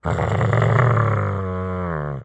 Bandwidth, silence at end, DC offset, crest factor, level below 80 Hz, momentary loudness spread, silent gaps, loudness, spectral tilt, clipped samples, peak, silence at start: 8.2 kHz; 0 s; under 0.1%; 18 dB; -42 dBFS; 9 LU; none; -20 LUFS; -8.5 dB/octave; under 0.1%; -2 dBFS; 0.05 s